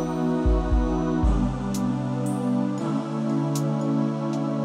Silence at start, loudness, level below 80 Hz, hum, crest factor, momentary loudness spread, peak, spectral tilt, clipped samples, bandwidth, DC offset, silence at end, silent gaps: 0 s; -25 LUFS; -30 dBFS; none; 12 dB; 3 LU; -10 dBFS; -7.5 dB/octave; under 0.1%; 14 kHz; under 0.1%; 0 s; none